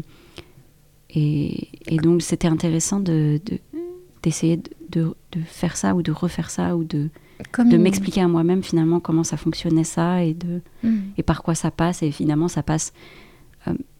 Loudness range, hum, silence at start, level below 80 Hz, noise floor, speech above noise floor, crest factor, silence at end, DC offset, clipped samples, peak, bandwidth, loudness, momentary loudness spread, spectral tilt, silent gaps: 4 LU; none; 0 s; -44 dBFS; -53 dBFS; 32 dB; 18 dB; 0.15 s; under 0.1%; under 0.1%; -4 dBFS; 14.5 kHz; -22 LUFS; 11 LU; -6 dB/octave; none